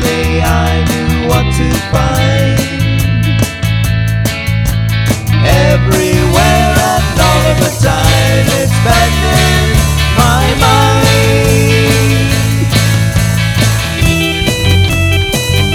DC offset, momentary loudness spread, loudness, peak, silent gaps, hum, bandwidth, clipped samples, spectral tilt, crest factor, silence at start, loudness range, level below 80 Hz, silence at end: under 0.1%; 4 LU; -10 LUFS; 0 dBFS; none; none; 19 kHz; 0.6%; -5 dB/octave; 10 dB; 0 s; 3 LU; -18 dBFS; 0 s